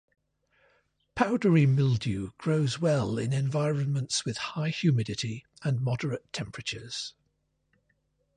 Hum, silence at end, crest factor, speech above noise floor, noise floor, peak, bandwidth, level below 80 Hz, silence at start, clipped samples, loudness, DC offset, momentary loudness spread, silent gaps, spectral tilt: none; 1.25 s; 20 dB; 48 dB; -75 dBFS; -10 dBFS; 10.5 kHz; -58 dBFS; 1.15 s; under 0.1%; -28 LUFS; under 0.1%; 12 LU; none; -6 dB/octave